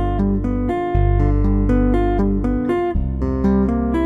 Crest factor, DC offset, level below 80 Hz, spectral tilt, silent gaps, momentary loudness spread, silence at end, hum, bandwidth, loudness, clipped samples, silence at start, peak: 12 dB; under 0.1%; -22 dBFS; -10 dB/octave; none; 4 LU; 0 s; none; 3.8 kHz; -19 LUFS; under 0.1%; 0 s; -6 dBFS